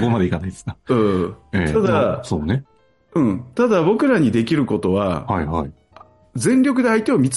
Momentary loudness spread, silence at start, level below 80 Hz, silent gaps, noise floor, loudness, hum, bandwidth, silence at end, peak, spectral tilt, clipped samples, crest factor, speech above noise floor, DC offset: 9 LU; 0 s; -44 dBFS; none; -48 dBFS; -19 LUFS; none; 11.5 kHz; 0 s; -6 dBFS; -6.5 dB/octave; under 0.1%; 12 dB; 30 dB; under 0.1%